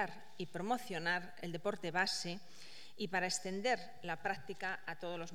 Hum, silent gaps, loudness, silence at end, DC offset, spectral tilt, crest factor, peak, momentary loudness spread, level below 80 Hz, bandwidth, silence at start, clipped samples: none; none; -40 LUFS; 0 s; 0.4%; -3 dB/octave; 22 dB; -20 dBFS; 10 LU; -80 dBFS; 18 kHz; 0 s; under 0.1%